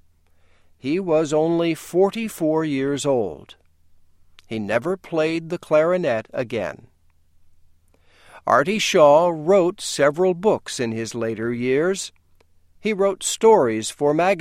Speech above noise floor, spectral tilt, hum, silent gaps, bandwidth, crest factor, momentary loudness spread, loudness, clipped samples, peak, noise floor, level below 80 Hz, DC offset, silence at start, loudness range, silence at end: 36 dB; -4.5 dB/octave; none; none; 16 kHz; 20 dB; 12 LU; -20 LUFS; under 0.1%; -2 dBFS; -56 dBFS; -58 dBFS; under 0.1%; 0.85 s; 6 LU; 0 s